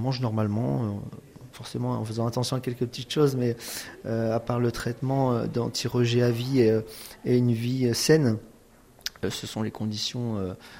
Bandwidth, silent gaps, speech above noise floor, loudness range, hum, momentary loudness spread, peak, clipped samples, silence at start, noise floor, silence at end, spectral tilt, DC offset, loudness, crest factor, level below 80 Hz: 16 kHz; none; 28 dB; 4 LU; none; 13 LU; -8 dBFS; under 0.1%; 0 s; -54 dBFS; 0 s; -6 dB/octave; under 0.1%; -27 LUFS; 20 dB; -56 dBFS